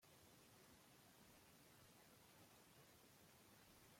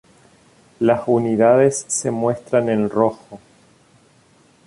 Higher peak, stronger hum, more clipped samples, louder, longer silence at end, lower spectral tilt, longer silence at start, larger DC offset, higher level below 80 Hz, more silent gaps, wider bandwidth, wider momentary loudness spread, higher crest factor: second, -56 dBFS vs -2 dBFS; neither; neither; second, -68 LUFS vs -18 LUFS; second, 0 s vs 1.3 s; second, -3 dB/octave vs -5.5 dB/octave; second, 0 s vs 0.8 s; neither; second, -88 dBFS vs -60 dBFS; neither; first, 16.5 kHz vs 11.5 kHz; second, 1 LU vs 7 LU; about the same, 14 dB vs 18 dB